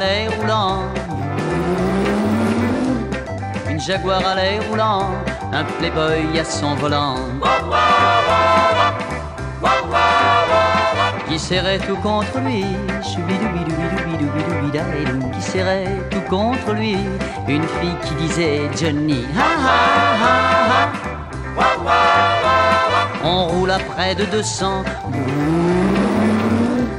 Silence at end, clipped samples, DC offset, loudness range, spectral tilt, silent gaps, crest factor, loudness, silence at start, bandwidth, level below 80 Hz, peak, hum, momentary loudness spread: 0 s; under 0.1%; under 0.1%; 5 LU; -5 dB/octave; none; 14 dB; -18 LUFS; 0 s; 15.5 kHz; -36 dBFS; -2 dBFS; none; 9 LU